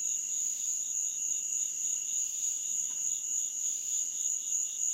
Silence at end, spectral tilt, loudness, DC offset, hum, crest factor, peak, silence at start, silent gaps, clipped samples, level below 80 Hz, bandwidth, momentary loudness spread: 0 s; 3.5 dB/octave; -30 LUFS; under 0.1%; none; 14 dB; -18 dBFS; 0 s; none; under 0.1%; -88 dBFS; 16 kHz; 1 LU